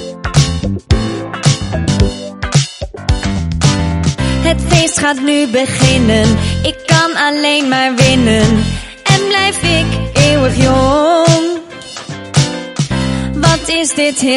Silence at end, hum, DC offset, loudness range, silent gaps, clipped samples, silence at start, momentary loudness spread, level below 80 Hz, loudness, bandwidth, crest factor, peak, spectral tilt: 0 s; none; under 0.1%; 4 LU; none; 0.1%; 0 s; 8 LU; -24 dBFS; -12 LUFS; 11.5 kHz; 12 dB; 0 dBFS; -4.5 dB/octave